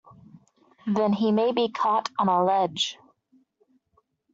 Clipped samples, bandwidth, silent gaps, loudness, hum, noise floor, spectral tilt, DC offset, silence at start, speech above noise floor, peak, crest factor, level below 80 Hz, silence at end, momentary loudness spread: under 0.1%; 7.8 kHz; none; -24 LUFS; none; -70 dBFS; -4 dB/octave; under 0.1%; 0.85 s; 46 dB; -10 dBFS; 16 dB; -72 dBFS; 1.4 s; 6 LU